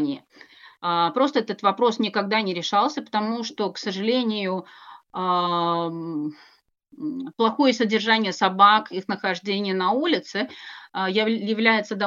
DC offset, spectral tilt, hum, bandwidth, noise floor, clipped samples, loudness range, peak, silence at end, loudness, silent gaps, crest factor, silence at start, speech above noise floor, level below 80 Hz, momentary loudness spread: under 0.1%; -5 dB/octave; none; 7.6 kHz; -50 dBFS; under 0.1%; 5 LU; -4 dBFS; 0 s; -23 LUFS; none; 20 dB; 0 s; 27 dB; -82 dBFS; 11 LU